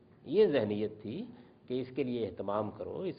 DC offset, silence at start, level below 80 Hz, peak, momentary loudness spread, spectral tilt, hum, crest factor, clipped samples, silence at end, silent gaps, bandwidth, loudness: under 0.1%; 0.25 s; -70 dBFS; -16 dBFS; 14 LU; -6 dB/octave; none; 18 dB; under 0.1%; 0 s; none; 5 kHz; -34 LUFS